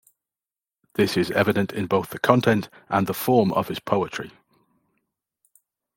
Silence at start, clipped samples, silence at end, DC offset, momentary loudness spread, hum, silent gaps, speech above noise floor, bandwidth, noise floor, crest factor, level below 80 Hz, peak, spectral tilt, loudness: 1 s; under 0.1%; 1.7 s; under 0.1%; 8 LU; none; none; over 68 dB; 17 kHz; under -90 dBFS; 22 dB; -62 dBFS; -2 dBFS; -6 dB/octave; -23 LUFS